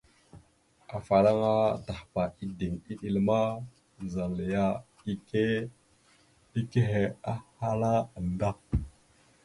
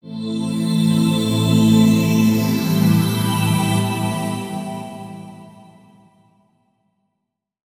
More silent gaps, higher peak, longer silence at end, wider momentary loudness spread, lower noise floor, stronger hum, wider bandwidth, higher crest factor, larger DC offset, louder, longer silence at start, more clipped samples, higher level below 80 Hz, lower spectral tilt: neither; second, -10 dBFS vs -2 dBFS; second, 0.55 s vs 2.15 s; second, 13 LU vs 17 LU; second, -64 dBFS vs -78 dBFS; neither; second, 11.5 kHz vs 16 kHz; about the same, 20 dB vs 16 dB; neither; second, -30 LUFS vs -17 LUFS; first, 0.35 s vs 0.05 s; neither; about the same, -48 dBFS vs -52 dBFS; first, -8 dB/octave vs -6 dB/octave